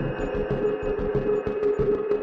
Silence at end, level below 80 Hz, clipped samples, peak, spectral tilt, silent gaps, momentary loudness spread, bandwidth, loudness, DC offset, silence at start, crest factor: 0 s; -38 dBFS; under 0.1%; -12 dBFS; -9 dB/octave; none; 3 LU; 7.4 kHz; -26 LUFS; under 0.1%; 0 s; 14 dB